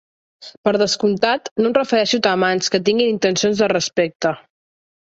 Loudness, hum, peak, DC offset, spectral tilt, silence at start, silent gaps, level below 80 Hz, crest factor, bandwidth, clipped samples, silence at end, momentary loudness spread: -18 LUFS; none; -2 dBFS; under 0.1%; -3.5 dB/octave; 0.4 s; 0.57-0.63 s, 1.51-1.56 s, 4.15-4.20 s; -60 dBFS; 16 dB; 8 kHz; under 0.1%; 0.7 s; 4 LU